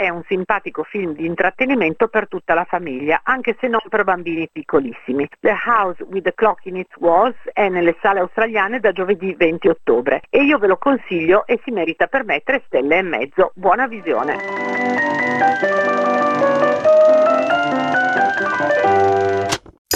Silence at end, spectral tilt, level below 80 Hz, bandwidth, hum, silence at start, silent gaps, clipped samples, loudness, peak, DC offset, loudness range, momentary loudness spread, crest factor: 0 s; -5 dB/octave; -54 dBFS; 13.5 kHz; none; 0 s; 19.78-19.85 s; under 0.1%; -17 LUFS; -2 dBFS; under 0.1%; 4 LU; 7 LU; 16 dB